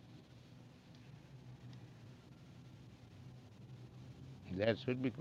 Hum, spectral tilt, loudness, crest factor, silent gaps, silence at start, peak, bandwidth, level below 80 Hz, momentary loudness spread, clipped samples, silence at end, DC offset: none; -7.5 dB/octave; -43 LUFS; 26 dB; none; 0 s; -20 dBFS; 11.5 kHz; -72 dBFS; 22 LU; under 0.1%; 0 s; under 0.1%